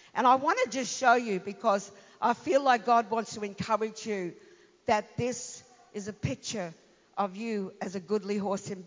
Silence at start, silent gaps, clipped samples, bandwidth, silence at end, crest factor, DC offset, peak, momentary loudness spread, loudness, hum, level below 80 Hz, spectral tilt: 0.15 s; none; under 0.1%; 7.6 kHz; 0 s; 20 dB; under 0.1%; -10 dBFS; 15 LU; -29 LUFS; none; -64 dBFS; -4.5 dB/octave